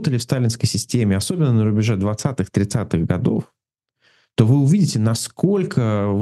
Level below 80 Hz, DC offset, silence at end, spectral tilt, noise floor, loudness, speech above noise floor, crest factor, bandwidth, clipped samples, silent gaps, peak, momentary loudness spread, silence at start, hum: -50 dBFS; under 0.1%; 0 s; -6.5 dB/octave; -68 dBFS; -19 LUFS; 50 dB; 18 dB; 12.5 kHz; under 0.1%; none; 0 dBFS; 6 LU; 0 s; none